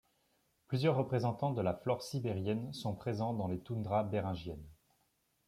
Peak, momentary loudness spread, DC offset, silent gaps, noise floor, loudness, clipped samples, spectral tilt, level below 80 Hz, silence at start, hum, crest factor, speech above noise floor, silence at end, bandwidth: -20 dBFS; 8 LU; under 0.1%; none; -77 dBFS; -36 LUFS; under 0.1%; -7.5 dB/octave; -66 dBFS; 0.7 s; none; 18 dB; 42 dB; 0.75 s; 15 kHz